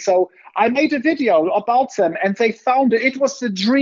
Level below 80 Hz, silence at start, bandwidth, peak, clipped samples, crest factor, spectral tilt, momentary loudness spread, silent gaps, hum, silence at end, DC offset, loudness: -68 dBFS; 0 s; 7.6 kHz; -2 dBFS; under 0.1%; 14 dB; -4.5 dB/octave; 4 LU; none; none; 0 s; under 0.1%; -17 LUFS